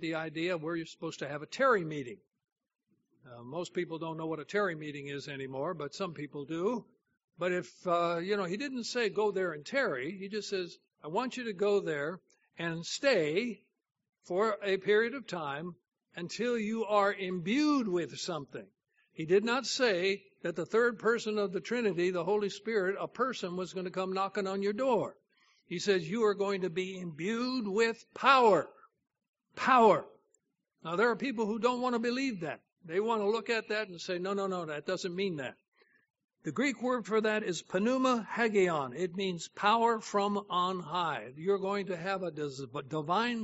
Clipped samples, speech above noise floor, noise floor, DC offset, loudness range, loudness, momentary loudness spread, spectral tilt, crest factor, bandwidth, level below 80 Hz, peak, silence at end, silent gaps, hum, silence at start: under 0.1%; 45 dB; -77 dBFS; under 0.1%; 6 LU; -32 LUFS; 12 LU; -3.5 dB/octave; 22 dB; 8 kHz; -80 dBFS; -10 dBFS; 0 s; 2.52-2.56 s, 7.24-7.28 s, 29.29-29.33 s, 35.68-35.72 s, 36.24-36.28 s; none; 0 s